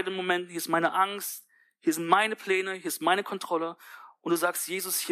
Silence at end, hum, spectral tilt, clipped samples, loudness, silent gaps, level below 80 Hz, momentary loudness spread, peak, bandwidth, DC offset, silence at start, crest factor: 0 s; none; -2.5 dB/octave; under 0.1%; -28 LUFS; none; -88 dBFS; 12 LU; -6 dBFS; 15.5 kHz; under 0.1%; 0 s; 22 dB